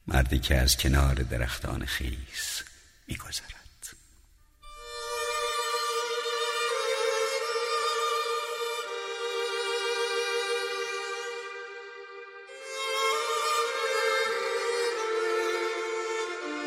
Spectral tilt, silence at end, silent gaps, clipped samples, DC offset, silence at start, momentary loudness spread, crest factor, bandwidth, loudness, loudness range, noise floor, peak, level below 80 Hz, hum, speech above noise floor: -3.5 dB/octave; 0 s; none; under 0.1%; under 0.1%; 0.05 s; 15 LU; 20 dB; 16 kHz; -29 LUFS; 7 LU; -59 dBFS; -10 dBFS; -38 dBFS; none; 31 dB